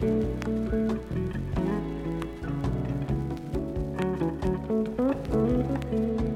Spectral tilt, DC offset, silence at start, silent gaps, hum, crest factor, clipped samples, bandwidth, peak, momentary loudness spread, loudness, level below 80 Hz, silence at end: -9 dB/octave; under 0.1%; 0 s; none; none; 14 dB; under 0.1%; 13.5 kHz; -14 dBFS; 6 LU; -29 LUFS; -38 dBFS; 0 s